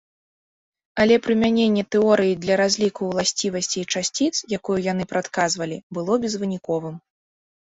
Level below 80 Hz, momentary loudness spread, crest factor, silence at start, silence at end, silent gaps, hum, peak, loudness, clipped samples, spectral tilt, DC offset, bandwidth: -58 dBFS; 9 LU; 18 dB; 0.95 s; 0.65 s; 5.83-5.90 s; none; -4 dBFS; -21 LUFS; under 0.1%; -4 dB/octave; under 0.1%; 8.4 kHz